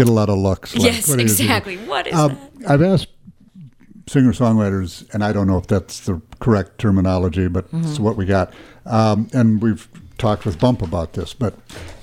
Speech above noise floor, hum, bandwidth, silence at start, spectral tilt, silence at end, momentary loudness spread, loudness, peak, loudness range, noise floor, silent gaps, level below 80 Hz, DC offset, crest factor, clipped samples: 25 dB; none; 17.5 kHz; 0 s; -5.5 dB/octave; 0.05 s; 11 LU; -18 LUFS; 0 dBFS; 2 LU; -43 dBFS; none; -40 dBFS; under 0.1%; 18 dB; under 0.1%